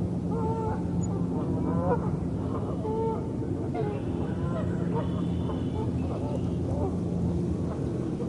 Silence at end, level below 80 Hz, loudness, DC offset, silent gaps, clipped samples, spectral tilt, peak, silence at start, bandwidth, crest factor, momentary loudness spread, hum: 0 s; -44 dBFS; -30 LUFS; under 0.1%; none; under 0.1%; -9 dB/octave; -12 dBFS; 0 s; 10.5 kHz; 16 dB; 3 LU; none